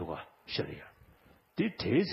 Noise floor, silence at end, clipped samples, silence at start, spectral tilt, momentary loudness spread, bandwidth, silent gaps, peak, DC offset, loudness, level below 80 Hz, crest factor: -63 dBFS; 0 s; under 0.1%; 0 s; -8.5 dB/octave; 17 LU; 14.5 kHz; none; -16 dBFS; under 0.1%; -35 LUFS; -62 dBFS; 18 dB